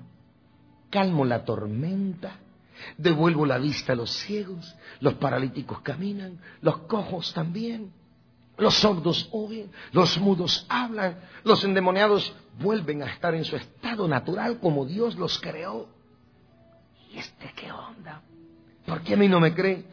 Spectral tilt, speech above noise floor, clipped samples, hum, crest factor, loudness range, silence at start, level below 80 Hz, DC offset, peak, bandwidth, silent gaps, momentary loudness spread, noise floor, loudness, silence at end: -6 dB/octave; 33 dB; under 0.1%; none; 22 dB; 8 LU; 0 s; -60 dBFS; under 0.1%; -4 dBFS; 5.4 kHz; none; 19 LU; -58 dBFS; -25 LUFS; 0 s